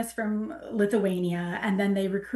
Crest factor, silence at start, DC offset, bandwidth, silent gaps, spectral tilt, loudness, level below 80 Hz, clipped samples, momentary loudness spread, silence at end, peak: 16 dB; 0 s; under 0.1%; 12.5 kHz; none; -6.5 dB/octave; -28 LUFS; -62 dBFS; under 0.1%; 6 LU; 0 s; -12 dBFS